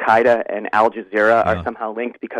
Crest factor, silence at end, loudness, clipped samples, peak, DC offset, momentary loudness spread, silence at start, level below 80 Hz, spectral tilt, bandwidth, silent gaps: 16 dB; 0 s; -18 LUFS; under 0.1%; -2 dBFS; under 0.1%; 11 LU; 0 s; -50 dBFS; -6.5 dB/octave; 11 kHz; none